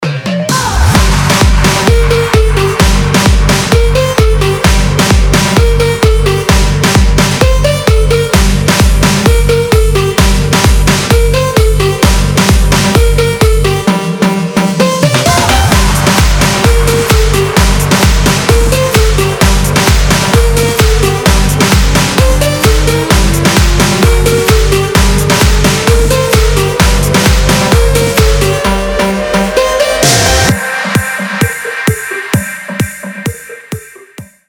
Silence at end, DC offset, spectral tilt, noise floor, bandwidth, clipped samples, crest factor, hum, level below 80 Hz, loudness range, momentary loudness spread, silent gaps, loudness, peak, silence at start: 0.25 s; under 0.1%; -4.5 dB/octave; -32 dBFS; 20 kHz; 0.2%; 8 dB; none; -12 dBFS; 1 LU; 4 LU; none; -9 LUFS; 0 dBFS; 0 s